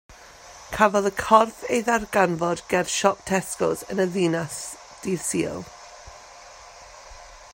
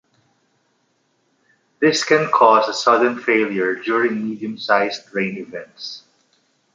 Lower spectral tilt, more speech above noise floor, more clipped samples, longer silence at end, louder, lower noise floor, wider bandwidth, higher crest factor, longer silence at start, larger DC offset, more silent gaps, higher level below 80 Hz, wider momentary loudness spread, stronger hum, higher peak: about the same, -4 dB/octave vs -4 dB/octave; second, 23 dB vs 47 dB; neither; second, 0.05 s vs 0.75 s; second, -23 LUFS vs -18 LUFS; second, -46 dBFS vs -66 dBFS; first, 16.5 kHz vs 9.2 kHz; first, 24 dB vs 18 dB; second, 0.1 s vs 1.8 s; neither; neither; first, -54 dBFS vs -72 dBFS; first, 25 LU vs 18 LU; neither; about the same, -2 dBFS vs -2 dBFS